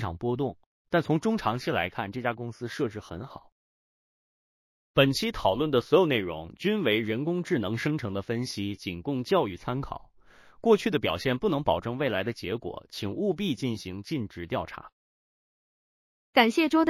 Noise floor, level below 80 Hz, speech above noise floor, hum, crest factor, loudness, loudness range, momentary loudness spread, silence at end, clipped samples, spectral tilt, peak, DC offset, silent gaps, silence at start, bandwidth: -55 dBFS; -54 dBFS; 28 dB; none; 22 dB; -28 LUFS; 7 LU; 12 LU; 0 s; under 0.1%; -6 dB/octave; -6 dBFS; under 0.1%; 0.66-0.85 s, 3.52-4.94 s, 14.92-16.33 s; 0 s; 16 kHz